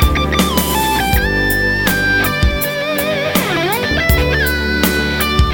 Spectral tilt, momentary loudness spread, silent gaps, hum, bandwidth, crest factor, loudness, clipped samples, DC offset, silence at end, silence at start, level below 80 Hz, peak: -4 dB/octave; 2 LU; none; none; 17 kHz; 14 dB; -14 LUFS; under 0.1%; under 0.1%; 0 s; 0 s; -22 dBFS; 0 dBFS